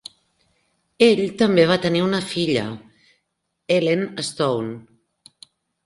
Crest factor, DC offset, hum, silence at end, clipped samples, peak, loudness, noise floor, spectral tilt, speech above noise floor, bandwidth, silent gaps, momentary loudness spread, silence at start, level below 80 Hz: 20 dB; under 0.1%; none; 1.05 s; under 0.1%; -2 dBFS; -20 LUFS; -75 dBFS; -5.5 dB/octave; 56 dB; 11.5 kHz; none; 16 LU; 1 s; -60 dBFS